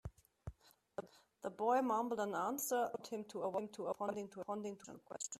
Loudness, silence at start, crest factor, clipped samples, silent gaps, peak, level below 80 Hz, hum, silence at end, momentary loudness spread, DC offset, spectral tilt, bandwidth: -41 LUFS; 0.05 s; 18 dB; under 0.1%; none; -24 dBFS; -68 dBFS; none; 0 s; 19 LU; under 0.1%; -4.5 dB/octave; 14.5 kHz